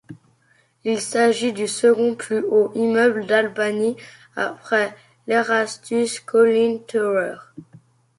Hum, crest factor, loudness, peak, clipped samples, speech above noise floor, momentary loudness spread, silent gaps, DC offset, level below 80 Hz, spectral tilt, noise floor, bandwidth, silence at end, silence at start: none; 16 dB; -20 LUFS; -4 dBFS; under 0.1%; 41 dB; 10 LU; none; under 0.1%; -70 dBFS; -4 dB/octave; -60 dBFS; 11.5 kHz; 0.55 s; 0.1 s